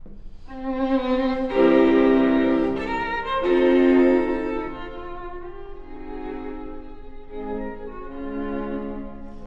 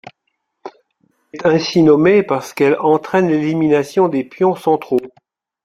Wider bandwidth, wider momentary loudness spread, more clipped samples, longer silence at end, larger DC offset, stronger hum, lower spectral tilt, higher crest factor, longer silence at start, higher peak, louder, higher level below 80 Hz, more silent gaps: second, 5.8 kHz vs 14 kHz; first, 21 LU vs 8 LU; neither; second, 0 s vs 0.55 s; neither; neither; about the same, -7.5 dB/octave vs -6.5 dB/octave; about the same, 16 dB vs 14 dB; second, 0 s vs 0.65 s; second, -6 dBFS vs -2 dBFS; second, -21 LUFS vs -15 LUFS; first, -40 dBFS vs -56 dBFS; neither